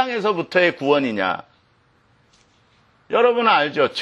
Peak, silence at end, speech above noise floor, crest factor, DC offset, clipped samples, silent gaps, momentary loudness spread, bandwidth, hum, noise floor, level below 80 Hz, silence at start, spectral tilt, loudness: -4 dBFS; 0 s; 41 dB; 18 dB; under 0.1%; under 0.1%; none; 7 LU; 8.2 kHz; none; -59 dBFS; -68 dBFS; 0 s; -5.5 dB/octave; -19 LUFS